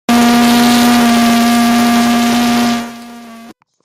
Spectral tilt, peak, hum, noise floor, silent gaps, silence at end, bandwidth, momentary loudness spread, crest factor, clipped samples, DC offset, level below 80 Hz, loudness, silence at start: -3.5 dB/octave; 0 dBFS; none; -37 dBFS; none; 0.35 s; 16 kHz; 7 LU; 10 dB; under 0.1%; under 0.1%; -42 dBFS; -10 LUFS; 0.1 s